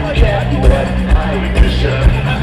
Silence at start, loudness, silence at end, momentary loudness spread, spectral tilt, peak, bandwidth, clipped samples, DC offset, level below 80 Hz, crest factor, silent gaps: 0 s; -14 LUFS; 0 s; 2 LU; -7 dB/octave; 0 dBFS; 11 kHz; under 0.1%; under 0.1%; -14 dBFS; 12 dB; none